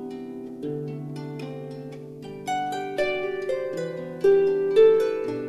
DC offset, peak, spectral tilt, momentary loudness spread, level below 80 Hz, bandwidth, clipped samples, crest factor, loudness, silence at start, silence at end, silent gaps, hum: under 0.1%; -8 dBFS; -6 dB/octave; 19 LU; -60 dBFS; 12 kHz; under 0.1%; 18 dB; -24 LUFS; 0 s; 0 s; none; none